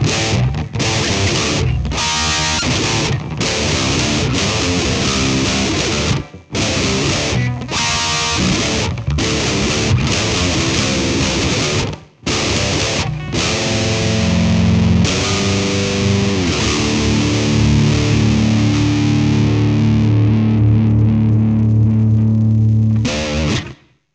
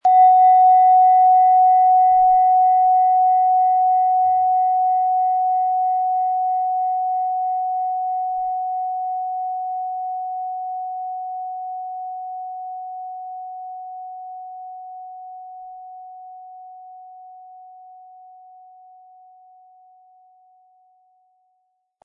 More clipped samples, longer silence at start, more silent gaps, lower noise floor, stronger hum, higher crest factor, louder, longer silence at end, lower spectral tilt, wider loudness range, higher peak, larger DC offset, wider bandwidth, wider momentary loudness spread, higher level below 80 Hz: neither; about the same, 0 s vs 0.05 s; neither; second, -36 dBFS vs -70 dBFS; neither; about the same, 14 dB vs 14 dB; about the same, -15 LUFS vs -17 LUFS; second, 0.4 s vs 4.4 s; about the same, -4.5 dB/octave vs -4 dB/octave; second, 3 LU vs 23 LU; first, -2 dBFS vs -6 dBFS; neither; first, 9.4 kHz vs 2.1 kHz; second, 5 LU vs 23 LU; first, -28 dBFS vs -68 dBFS